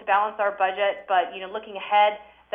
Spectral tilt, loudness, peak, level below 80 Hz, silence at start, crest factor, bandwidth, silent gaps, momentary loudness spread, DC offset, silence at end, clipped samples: -5 dB/octave; -24 LUFS; -8 dBFS; -70 dBFS; 0 s; 16 dB; 3.8 kHz; none; 13 LU; under 0.1%; 0.3 s; under 0.1%